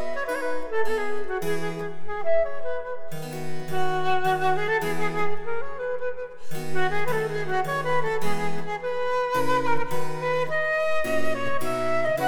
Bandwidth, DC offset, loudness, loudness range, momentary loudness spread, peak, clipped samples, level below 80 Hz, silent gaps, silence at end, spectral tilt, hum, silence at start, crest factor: 19.5 kHz; under 0.1%; -27 LUFS; 3 LU; 9 LU; -10 dBFS; under 0.1%; -52 dBFS; none; 0 s; -5 dB/octave; none; 0 s; 12 dB